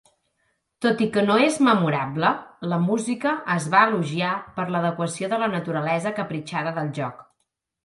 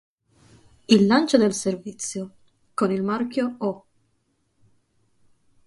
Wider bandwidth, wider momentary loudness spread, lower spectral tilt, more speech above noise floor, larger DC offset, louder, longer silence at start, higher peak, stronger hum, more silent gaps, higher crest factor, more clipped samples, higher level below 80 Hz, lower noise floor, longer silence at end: about the same, 11.5 kHz vs 11.5 kHz; second, 10 LU vs 17 LU; about the same, -5.5 dB/octave vs -5 dB/octave; first, 54 dB vs 48 dB; neither; about the same, -23 LUFS vs -22 LUFS; about the same, 0.8 s vs 0.9 s; about the same, -4 dBFS vs -2 dBFS; neither; neither; about the same, 20 dB vs 22 dB; neither; about the same, -66 dBFS vs -64 dBFS; first, -76 dBFS vs -70 dBFS; second, 0.6 s vs 1.9 s